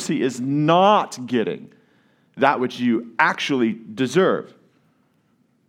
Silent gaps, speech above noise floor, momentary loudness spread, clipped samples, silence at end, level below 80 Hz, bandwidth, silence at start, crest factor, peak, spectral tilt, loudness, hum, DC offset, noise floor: none; 43 dB; 9 LU; under 0.1%; 1.25 s; -76 dBFS; 14 kHz; 0 s; 20 dB; 0 dBFS; -5.5 dB/octave; -20 LUFS; none; under 0.1%; -63 dBFS